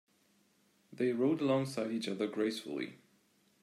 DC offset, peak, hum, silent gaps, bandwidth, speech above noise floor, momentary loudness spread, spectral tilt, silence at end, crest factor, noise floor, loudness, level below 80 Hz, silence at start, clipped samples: under 0.1%; -18 dBFS; none; none; 14.5 kHz; 37 dB; 10 LU; -6 dB/octave; 0.65 s; 18 dB; -71 dBFS; -35 LUFS; -84 dBFS; 0.9 s; under 0.1%